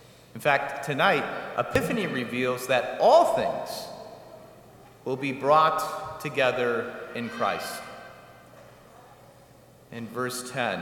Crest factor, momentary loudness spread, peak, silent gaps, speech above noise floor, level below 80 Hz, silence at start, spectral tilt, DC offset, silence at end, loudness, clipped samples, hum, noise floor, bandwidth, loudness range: 22 dB; 20 LU; -6 dBFS; none; 28 dB; -62 dBFS; 0.35 s; -4.5 dB/octave; under 0.1%; 0 s; -26 LUFS; under 0.1%; none; -53 dBFS; 18 kHz; 11 LU